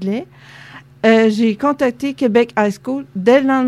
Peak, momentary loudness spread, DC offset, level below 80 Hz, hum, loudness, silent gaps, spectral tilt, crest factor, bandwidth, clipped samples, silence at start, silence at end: 0 dBFS; 11 LU; under 0.1%; -58 dBFS; none; -16 LUFS; none; -6 dB/octave; 16 dB; 12.5 kHz; under 0.1%; 0 s; 0 s